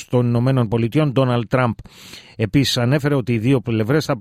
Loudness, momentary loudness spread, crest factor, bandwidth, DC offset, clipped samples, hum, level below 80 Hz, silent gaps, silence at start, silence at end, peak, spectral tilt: -18 LUFS; 10 LU; 14 dB; 15 kHz; under 0.1%; under 0.1%; none; -46 dBFS; none; 0 s; 0 s; -4 dBFS; -6.5 dB/octave